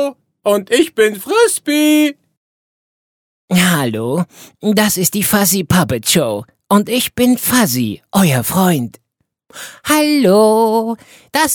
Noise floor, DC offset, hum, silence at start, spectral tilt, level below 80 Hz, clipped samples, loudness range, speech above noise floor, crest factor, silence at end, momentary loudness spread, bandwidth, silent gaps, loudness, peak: -54 dBFS; under 0.1%; none; 0 s; -4 dB/octave; -48 dBFS; under 0.1%; 3 LU; 41 dB; 14 dB; 0 s; 10 LU; over 20 kHz; 2.37-3.48 s; -14 LUFS; 0 dBFS